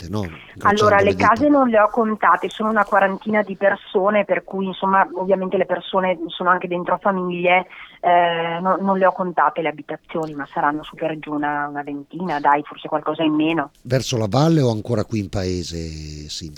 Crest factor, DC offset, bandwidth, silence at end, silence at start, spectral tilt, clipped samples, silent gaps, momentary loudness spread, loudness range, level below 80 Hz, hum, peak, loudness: 18 dB; under 0.1%; 15 kHz; 0 s; 0 s; -6 dB/octave; under 0.1%; none; 11 LU; 6 LU; -48 dBFS; none; -2 dBFS; -19 LUFS